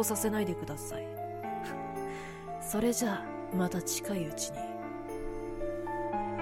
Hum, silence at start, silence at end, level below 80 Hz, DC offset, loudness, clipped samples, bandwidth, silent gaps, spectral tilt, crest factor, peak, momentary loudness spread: none; 0 s; 0 s; -52 dBFS; under 0.1%; -35 LUFS; under 0.1%; 16.5 kHz; none; -4.5 dB/octave; 16 dB; -18 dBFS; 10 LU